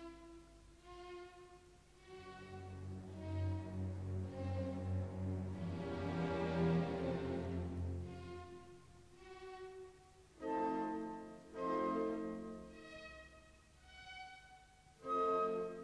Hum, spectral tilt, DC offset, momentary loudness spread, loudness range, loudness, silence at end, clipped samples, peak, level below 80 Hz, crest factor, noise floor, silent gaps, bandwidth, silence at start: none; -8 dB/octave; under 0.1%; 22 LU; 8 LU; -43 LUFS; 0 s; under 0.1%; -26 dBFS; -62 dBFS; 18 dB; -64 dBFS; none; 11 kHz; 0 s